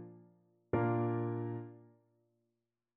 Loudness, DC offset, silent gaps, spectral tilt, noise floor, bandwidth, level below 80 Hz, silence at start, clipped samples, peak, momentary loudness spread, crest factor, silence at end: -37 LUFS; under 0.1%; none; -9.5 dB/octave; -87 dBFS; 3.5 kHz; -68 dBFS; 0 s; under 0.1%; -20 dBFS; 18 LU; 18 dB; 1.1 s